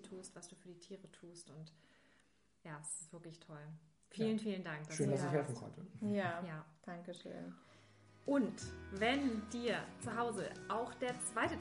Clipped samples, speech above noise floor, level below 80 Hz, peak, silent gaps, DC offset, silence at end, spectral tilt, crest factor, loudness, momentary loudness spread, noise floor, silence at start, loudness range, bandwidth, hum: under 0.1%; 33 dB; -70 dBFS; -22 dBFS; none; under 0.1%; 0 s; -5 dB/octave; 20 dB; -41 LUFS; 18 LU; -75 dBFS; 0 s; 13 LU; 10.5 kHz; none